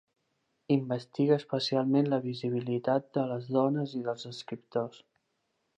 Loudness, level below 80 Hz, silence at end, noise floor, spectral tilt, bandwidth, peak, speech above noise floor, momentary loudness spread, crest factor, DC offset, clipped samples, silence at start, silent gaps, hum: -31 LUFS; -80 dBFS; 0.8 s; -79 dBFS; -7.5 dB/octave; 8.8 kHz; -12 dBFS; 49 dB; 9 LU; 18 dB; under 0.1%; under 0.1%; 0.7 s; none; none